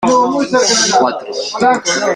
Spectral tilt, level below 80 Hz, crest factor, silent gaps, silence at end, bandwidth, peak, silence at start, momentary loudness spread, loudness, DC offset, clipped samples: -2 dB/octave; -54 dBFS; 12 dB; none; 0 s; 12 kHz; 0 dBFS; 0 s; 8 LU; -13 LUFS; under 0.1%; under 0.1%